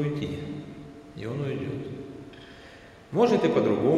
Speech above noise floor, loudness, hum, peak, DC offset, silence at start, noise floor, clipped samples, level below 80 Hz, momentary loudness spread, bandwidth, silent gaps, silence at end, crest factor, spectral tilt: 24 dB; -27 LUFS; none; -10 dBFS; under 0.1%; 0 s; -49 dBFS; under 0.1%; -58 dBFS; 24 LU; 11.5 kHz; none; 0 s; 18 dB; -7.5 dB/octave